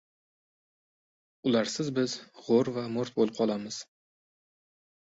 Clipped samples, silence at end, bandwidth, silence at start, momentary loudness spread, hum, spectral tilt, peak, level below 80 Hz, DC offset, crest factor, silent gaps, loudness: under 0.1%; 1.25 s; 8 kHz; 1.45 s; 10 LU; none; -5 dB/octave; -12 dBFS; -72 dBFS; under 0.1%; 20 dB; none; -30 LUFS